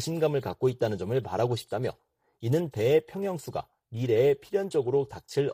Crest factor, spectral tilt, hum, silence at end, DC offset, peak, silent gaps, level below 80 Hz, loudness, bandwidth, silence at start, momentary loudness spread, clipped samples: 16 dB; -6.5 dB/octave; none; 0 s; under 0.1%; -12 dBFS; none; -62 dBFS; -28 LUFS; 15.5 kHz; 0 s; 11 LU; under 0.1%